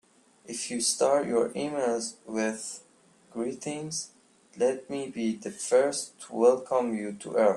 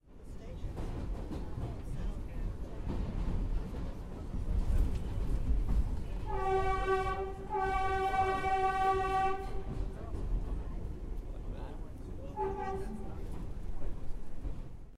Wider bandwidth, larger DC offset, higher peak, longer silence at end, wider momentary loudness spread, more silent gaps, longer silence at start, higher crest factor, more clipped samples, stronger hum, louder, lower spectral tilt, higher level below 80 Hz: about the same, 12.5 kHz vs 12 kHz; neither; first, -10 dBFS vs -18 dBFS; about the same, 0 s vs 0 s; about the same, 12 LU vs 14 LU; neither; first, 0.5 s vs 0.1 s; about the same, 18 dB vs 16 dB; neither; neither; first, -29 LUFS vs -37 LUFS; second, -3.5 dB/octave vs -7 dB/octave; second, -74 dBFS vs -38 dBFS